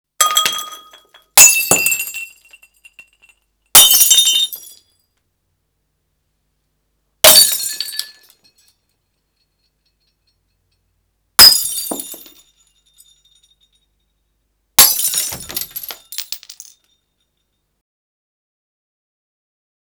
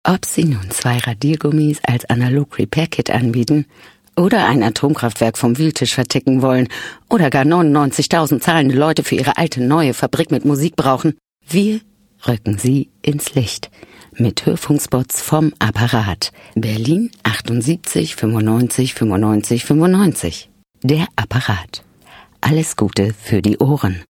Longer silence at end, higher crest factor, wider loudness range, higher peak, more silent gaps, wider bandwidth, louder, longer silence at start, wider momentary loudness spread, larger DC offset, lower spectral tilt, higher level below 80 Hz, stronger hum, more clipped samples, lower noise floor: first, 3.45 s vs 0.05 s; about the same, 18 dB vs 16 dB; first, 14 LU vs 4 LU; about the same, 0 dBFS vs 0 dBFS; neither; first, over 20 kHz vs 17.5 kHz; first, -9 LUFS vs -16 LUFS; first, 0.2 s vs 0.05 s; first, 22 LU vs 7 LU; neither; second, 1.5 dB/octave vs -5.5 dB/octave; second, -52 dBFS vs -46 dBFS; neither; first, 0.5% vs under 0.1%; first, -69 dBFS vs -44 dBFS